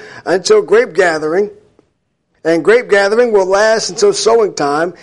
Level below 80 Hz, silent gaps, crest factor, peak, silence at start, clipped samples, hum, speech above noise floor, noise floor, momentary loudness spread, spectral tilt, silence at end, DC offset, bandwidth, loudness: -54 dBFS; none; 12 dB; 0 dBFS; 0 s; under 0.1%; none; 52 dB; -64 dBFS; 6 LU; -3 dB/octave; 0.1 s; under 0.1%; 11.5 kHz; -12 LUFS